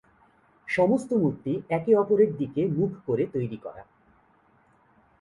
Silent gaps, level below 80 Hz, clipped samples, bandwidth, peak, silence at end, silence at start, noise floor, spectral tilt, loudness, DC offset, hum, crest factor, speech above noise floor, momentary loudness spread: none; -64 dBFS; under 0.1%; 11.5 kHz; -10 dBFS; 1.4 s; 0.65 s; -62 dBFS; -8.5 dB/octave; -25 LUFS; under 0.1%; none; 18 dB; 37 dB; 11 LU